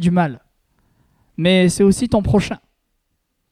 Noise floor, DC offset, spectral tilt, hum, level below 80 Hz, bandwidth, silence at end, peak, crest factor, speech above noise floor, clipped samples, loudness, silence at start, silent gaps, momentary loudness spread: -70 dBFS; under 0.1%; -6 dB/octave; none; -40 dBFS; 14 kHz; 0.95 s; -2 dBFS; 16 dB; 55 dB; under 0.1%; -17 LUFS; 0 s; none; 14 LU